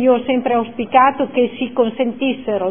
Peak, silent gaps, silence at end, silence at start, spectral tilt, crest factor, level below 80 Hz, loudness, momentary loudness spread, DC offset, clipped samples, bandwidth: 0 dBFS; none; 0 s; 0 s; -9.5 dB/octave; 16 dB; -58 dBFS; -17 LUFS; 6 LU; 0.6%; under 0.1%; 3.6 kHz